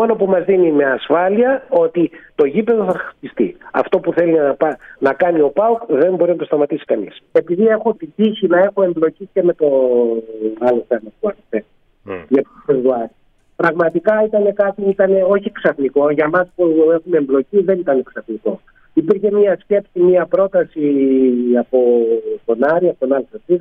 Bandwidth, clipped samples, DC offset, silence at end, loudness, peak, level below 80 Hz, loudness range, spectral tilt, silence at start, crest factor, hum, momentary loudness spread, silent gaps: 4.5 kHz; under 0.1%; under 0.1%; 0 s; -16 LUFS; -2 dBFS; -58 dBFS; 3 LU; -9 dB/octave; 0 s; 14 dB; none; 8 LU; none